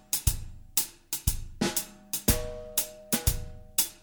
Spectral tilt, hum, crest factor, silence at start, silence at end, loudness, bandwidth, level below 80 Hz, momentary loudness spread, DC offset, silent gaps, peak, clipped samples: -3 dB/octave; none; 24 dB; 0.1 s; 0.05 s; -30 LUFS; over 20 kHz; -38 dBFS; 5 LU; under 0.1%; none; -8 dBFS; under 0.1%